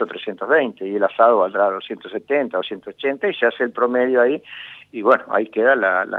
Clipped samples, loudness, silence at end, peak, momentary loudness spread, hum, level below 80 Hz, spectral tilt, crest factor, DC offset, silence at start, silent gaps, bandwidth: under 0.1%; -19 LUFS; 0 s; 0 dBFS; 13 LU; none; -74 dBFS; -6.5 dB/octave; 20 dB; under 0.1%; 0 s; none; 4.3 kHz